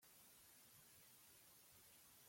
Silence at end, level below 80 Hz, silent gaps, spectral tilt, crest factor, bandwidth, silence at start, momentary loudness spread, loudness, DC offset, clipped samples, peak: 0 s; under -90 dBFS; none; -1 dB/octave; 14 dB; 16.5 kHz; 0 s; 0 LU; -66 LUFS; under 0.1%; under 0.1%; -56 dBFS